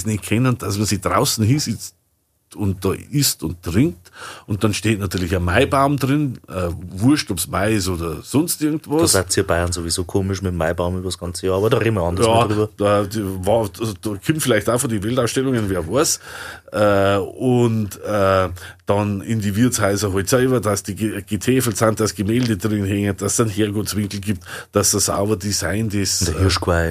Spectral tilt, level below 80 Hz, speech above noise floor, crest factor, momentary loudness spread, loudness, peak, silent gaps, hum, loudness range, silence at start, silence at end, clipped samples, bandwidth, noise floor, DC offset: -4.5 dB/octave; -42 dBFS; 46 dB; 18 dB; 8 LU; -19 LUFS; 0 dBFS; none; none; 2 LU; 0 s; 0 s; under 0.1%; 15.5 kHz; -65 dBFS; under 0.1%